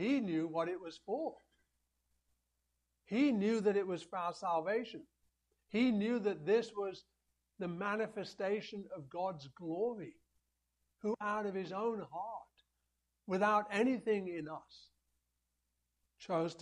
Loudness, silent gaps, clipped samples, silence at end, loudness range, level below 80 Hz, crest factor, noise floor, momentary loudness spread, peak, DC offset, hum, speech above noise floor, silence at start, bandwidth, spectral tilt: -37 LUFS; none; under 0.1%; 0 s; 5 LU; -80 dBFS; 18 dB; -85 dBFS; 14 LU; -20 dBFS; under 0.1%; 60 Hz at -75 dBFS; 48 dB; 0 s; 10.5 kHz; -6.5 dB/octave